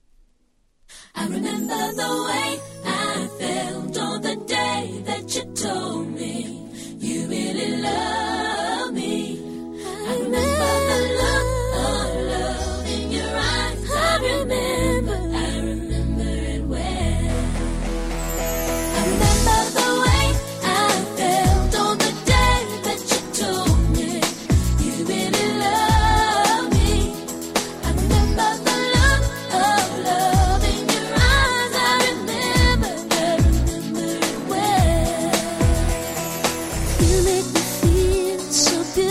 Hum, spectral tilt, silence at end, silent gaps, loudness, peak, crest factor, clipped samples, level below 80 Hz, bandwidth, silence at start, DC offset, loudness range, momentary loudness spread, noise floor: none; -4 dB/octave; 0 s; none; -21 LUFS; -4 dBFS; 18 dB; under 0.1%; -26 dBFS; 16 kHz; 0.9 s; under 0.1%; 7 LU; 9 LU; -62 dBFS